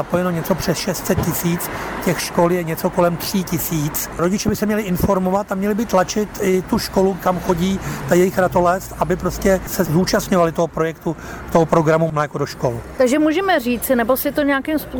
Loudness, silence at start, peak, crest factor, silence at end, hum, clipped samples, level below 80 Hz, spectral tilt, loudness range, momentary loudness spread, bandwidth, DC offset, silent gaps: -18 LUFS; 0 s; -4 dBFS; 14 dB; 0 s; none; under 0.1%; -38 dBFS; -5.5 dB/octave; 2 LU; 6 LU; over 20 kHz; under 0.1%; none